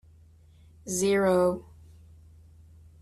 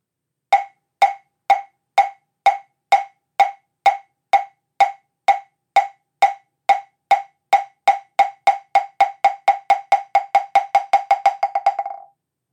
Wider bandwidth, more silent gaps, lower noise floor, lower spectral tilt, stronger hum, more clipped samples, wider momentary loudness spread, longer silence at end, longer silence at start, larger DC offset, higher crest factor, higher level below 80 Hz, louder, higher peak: first, 13.5 kHz vs 12 kHz; neither; second, -55 dBFS vs -81 dBFS; first, -5 dB/octave vs 0 dB/octave; neither; neither; first, 16 LU vs 6 LU; first, 1.4 s vs 0.55 s; first, 0.85 s vs 0.5 s; neither; about the same, 16 dB vs 16 dB; first, -58 dBFS vs -78 dBFS; second, -26 LUFS vs -19 LUFS; second, -14 dBFS vs -4 dBFS